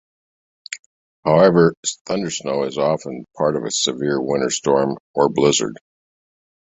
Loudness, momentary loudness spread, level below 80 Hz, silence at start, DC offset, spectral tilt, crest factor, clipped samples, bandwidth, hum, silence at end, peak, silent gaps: -19 LUFS; 14 LU; -56 dBFS; 0.7 s; under 0.1%; -4.5 dB/octave; 18 dB; under 0.1%; 8.4 kHz; none; 0.95 s; -2 dBFS; 0.79-1.23 s, 1.77-1.83 s, 2.01-2.05 s, 5.00-5.14 s